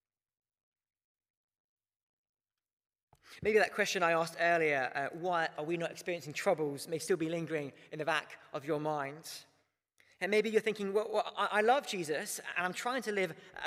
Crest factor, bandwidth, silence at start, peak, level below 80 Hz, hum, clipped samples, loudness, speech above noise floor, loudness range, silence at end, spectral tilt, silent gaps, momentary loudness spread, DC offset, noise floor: 20 dB; 15.5 kHz; 3.3 s; -16 dBFS; -76 dBFS; none; under 0.1%; -33 LUFS; 42 dB; 5 LU; 0 s; -4 dB/octave; none; 10 LU; under 0.1%; -76 dBFS